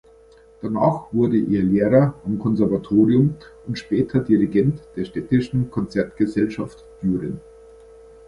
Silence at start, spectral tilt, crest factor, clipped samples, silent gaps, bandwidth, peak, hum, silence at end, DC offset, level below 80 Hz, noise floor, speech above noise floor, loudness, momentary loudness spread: 0.6 s; -9 dB/octave; 18 dB; under 0.1%; none; 11 kHz; -2 dBFS; none; 0.9 s; under 0.1%; -48 dBFS; -49 dBFS; 30 dB; -21 LUFS; 14 LU